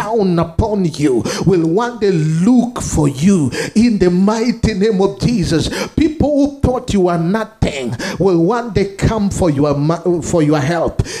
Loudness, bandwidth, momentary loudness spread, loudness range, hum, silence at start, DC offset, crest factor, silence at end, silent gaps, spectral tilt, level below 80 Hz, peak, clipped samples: -15 LUFS; 14 kHz; 5 LU; 2 LU; none; 0 s; under 0.1%; 14 dB; 0 s; none; -6.5 dB/octave; -32 dBFS; 0 dBFS; under 0.1%